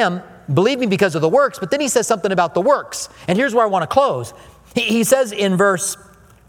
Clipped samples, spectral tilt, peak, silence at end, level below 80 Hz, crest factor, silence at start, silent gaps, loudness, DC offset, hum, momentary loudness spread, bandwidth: under 0.1%; -4.5 dB/octave; 0 dBFS; 0.55 s; -54 dBFS; 18 dB; 0 s; none; -17 LUFS; under 0.1%; none; 10 LU; 18.5 kHz